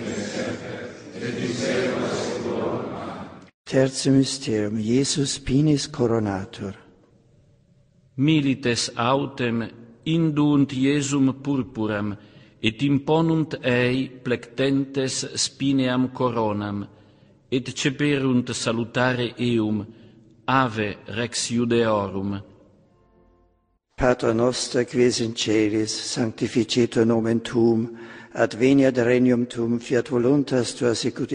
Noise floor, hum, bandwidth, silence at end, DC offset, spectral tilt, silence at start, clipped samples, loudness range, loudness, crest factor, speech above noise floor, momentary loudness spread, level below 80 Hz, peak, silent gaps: -67 dBFS; none; 10.5 kHz; 0 s; under 0.1%; -5 dB/octave; 0 s; under 0.1%; 4 LU; -23 LUFS; 20 dB; 45 dB; 11 LU; -52 dBFS; -4 dBFS; 3.54-3.64 s